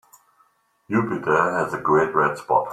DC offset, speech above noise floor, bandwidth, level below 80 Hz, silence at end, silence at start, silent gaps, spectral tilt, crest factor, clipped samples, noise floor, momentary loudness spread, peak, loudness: under 0.1%; 42 dB; 13.5 kHz; -60 dBFS; 0 s; 0.9 s; none; -7 dB/octave; 18 dB; under 0.1%; -63 dBFS; 5 LU; -4 dBFS; -21 LUFS